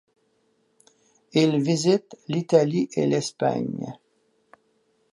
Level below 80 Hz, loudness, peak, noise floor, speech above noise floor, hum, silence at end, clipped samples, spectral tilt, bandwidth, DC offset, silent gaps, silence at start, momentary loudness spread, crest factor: -72 dBFS; -23 LUFS; -4 dBFS; -68 dBFS; 45 dB; none; 1.2 s; under 0.1%; -6 dB/octave; 11.5 kHz; under 0.1%; none; 1.35 s; 10 LU; 20 dB